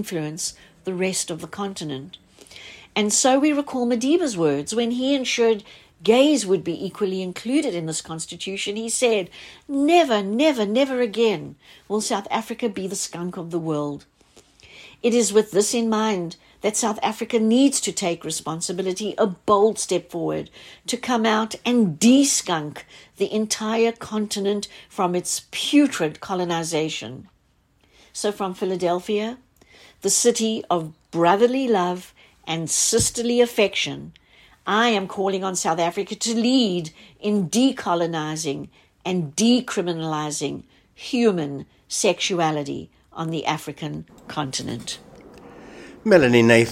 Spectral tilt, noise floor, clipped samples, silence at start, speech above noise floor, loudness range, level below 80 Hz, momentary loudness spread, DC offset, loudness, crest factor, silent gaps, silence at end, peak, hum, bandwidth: -3.5 dB/octave; -62 dBFS; under 0.1%; 0 s; 40 dB; 5 LU; -58 dBFS; 14 LU; under 0.1%; -22 LUFS; 22 dB; none; 0 s; 0 dBFS; none; 16 kHz